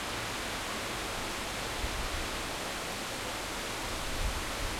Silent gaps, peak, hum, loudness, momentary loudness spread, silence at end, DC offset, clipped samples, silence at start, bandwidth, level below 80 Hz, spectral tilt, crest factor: none; -20 dBFS; none; -35 LUFS; 1 LU; 0 s; under 0.1%; under 0.1%; 0 s; 16.5 kHz; -42 dBFS; -2.5 dB/octave; 14 dB